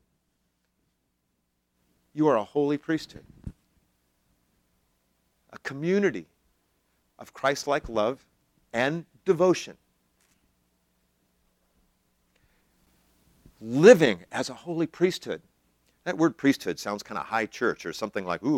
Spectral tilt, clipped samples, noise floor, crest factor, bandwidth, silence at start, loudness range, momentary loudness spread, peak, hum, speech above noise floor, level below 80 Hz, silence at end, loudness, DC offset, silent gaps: -5.5 dB/octave; under 0.1%; -76 dBFS; 26 dB; 16 kHz; 2.15 s; 9 LU; 18 LU; -2 dBFS; none; 51 dB; -60 dBFS; 0 s; -25 LUFS; under 0.1%; none